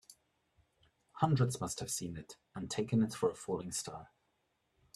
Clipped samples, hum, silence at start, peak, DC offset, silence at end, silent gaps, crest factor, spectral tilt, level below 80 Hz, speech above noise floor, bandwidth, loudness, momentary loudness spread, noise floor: under 0.1%; none; 0.1 s; -16 dBFS; under 0.1%; 0.9 s; none; 22 dB; -5.5 dB/octave; -68 dBFS; 44 dB; 14 kHz; -36 LUFS; 15 LU; -80 dBFS